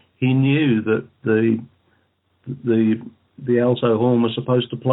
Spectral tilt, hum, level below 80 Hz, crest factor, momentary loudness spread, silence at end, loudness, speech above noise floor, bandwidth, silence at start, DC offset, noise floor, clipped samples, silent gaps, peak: -12.5 dB/octave; none; -66 dBFS; 14 dB; 9 LU; 0 s; -19 LUFS; 46 dB; 4.1 kHz; 0.2 s; under 0.1%; -65 dBFS; under 0.1%; none; -6 dBFS